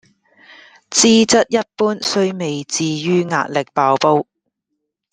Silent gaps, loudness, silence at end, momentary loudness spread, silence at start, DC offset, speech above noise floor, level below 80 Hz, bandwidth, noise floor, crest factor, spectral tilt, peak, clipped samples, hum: none; -16 LUFS; 0.9 s; 8 LU; 0.9 s; under 0.1%; 60 dB; -58 dBFS; 10 kHz; -76 dBFS; 18 dB; -3.5 dB/octave; 0 dBFS; under 0.1%; none